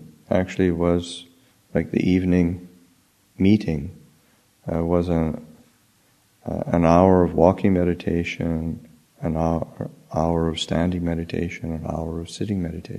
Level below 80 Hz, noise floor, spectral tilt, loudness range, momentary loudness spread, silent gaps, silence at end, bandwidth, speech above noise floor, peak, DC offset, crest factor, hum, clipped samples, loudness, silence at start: -42 dBFS; -60 dBFS; -7.5 dB/octave; 5 LU; 14 LU; none; 0 s; 12 kHz; 39 dB; 0 dBFS; under 0.1%; 22 dB; none; under 0.1%; -22 LUFS; 0 s